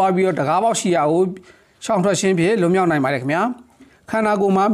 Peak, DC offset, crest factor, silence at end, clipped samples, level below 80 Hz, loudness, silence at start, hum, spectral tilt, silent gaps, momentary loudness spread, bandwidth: -8 dBFS; under 0.1%; 10 dB; 0 s; under 0.1%; -60 dBFS; -18 LUFS; 0 s; none; -5.5 dB/octave; none; 8 LU; 14 kHz